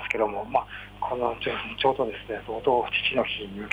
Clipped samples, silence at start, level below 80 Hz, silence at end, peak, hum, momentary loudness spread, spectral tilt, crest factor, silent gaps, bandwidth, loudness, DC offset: under 0.1%; 0 s; -52 dBFS; 0 s; -10 dBFS; 50 Hz at -50 dBFS; 9 LU; -5.5 dB/octave; 18 dB; none; 12 kHz; -27 LUFS; under 0.1%